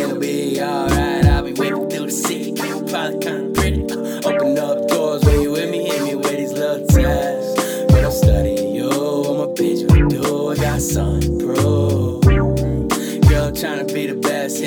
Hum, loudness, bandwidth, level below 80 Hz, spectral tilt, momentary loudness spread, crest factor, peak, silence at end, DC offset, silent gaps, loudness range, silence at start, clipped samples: none; -18 LUFS; over 20 kHz; -26 dBFS; -6 dB/octave; 7 LU; 16 dB; 0 dBFS; 0 s; under 0.1%; none; 3 LU; 0 s; under 0.1%